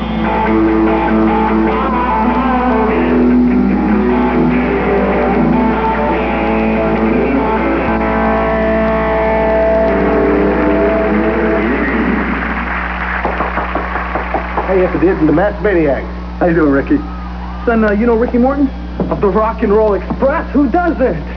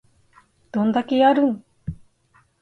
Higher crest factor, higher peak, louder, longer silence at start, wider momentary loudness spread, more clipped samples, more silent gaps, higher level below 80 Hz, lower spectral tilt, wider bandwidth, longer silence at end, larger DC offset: second, 12 dB vs 18 dB; first, -2 dBFS vs -6 dBFS; first, -13 LUFS vs -20 LUFS; second, 0 s vs 0.75 s; second, 6 LU vs 19 LU; neither; neither; first, -24 dBFS vs -52 dBFS; first, -9.5 dB/octave vs -7.5 dB/octave; second, 5.4 kHz vs 7.6 kHz; second, 0 s vs 0.7 s; first, 0.7% vs under 0.1%